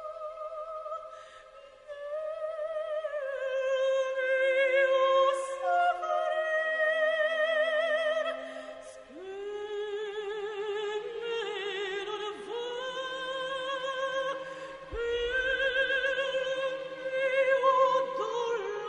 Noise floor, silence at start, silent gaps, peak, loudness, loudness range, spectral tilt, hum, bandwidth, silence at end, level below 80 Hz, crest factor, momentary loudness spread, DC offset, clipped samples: -52 dBFS; 0 s; none; -14 dBFS; -30 LUFS; 9 LU; -2 dB/octave; none; 10.5 kHz; 0 s; -60 dBFS; 18 dB; 15 LU; under 0.1%; under 0.1%